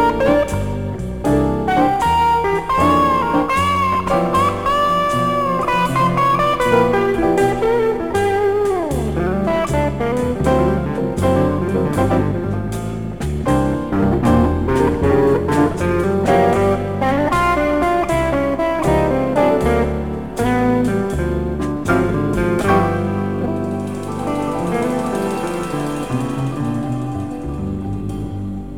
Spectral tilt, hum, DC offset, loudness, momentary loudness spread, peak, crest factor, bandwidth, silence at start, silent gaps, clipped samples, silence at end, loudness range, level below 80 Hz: -7 dB/octave; none; 0.9%; -17 LUFS; 8 LU; -2 dBFS; 16 dB; 19 kHz; 0 s; none; under 0.1%; 0 s; 5 LU; -32 dBFS